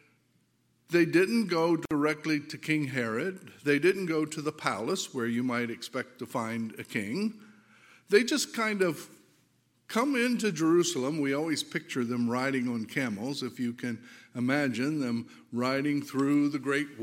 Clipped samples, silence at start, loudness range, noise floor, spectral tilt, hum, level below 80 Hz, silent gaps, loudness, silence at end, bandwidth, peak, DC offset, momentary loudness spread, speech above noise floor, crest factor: under 0.1%; 0.9 s; 4 LU; -70 dBFS; -5 dB/octave; none; -76 dBFS; none; -30 LUFS; 0 s; 16.5 kHz; -8 dBFS; under 0.1%; 10 LU; 41 dB; 22 dB